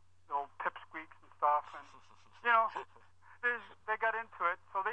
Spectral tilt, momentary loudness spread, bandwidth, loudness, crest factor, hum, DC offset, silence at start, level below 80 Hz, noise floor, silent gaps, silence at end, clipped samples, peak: -3.5 dB/octave; 18 LU; 8.6 kHz; -35 LUFS; 22 dB; none; under 0.1%; 0.3 s; -80 dBFS; -63 dBFS; none; 0 s; under 0.1%; -16 dBFS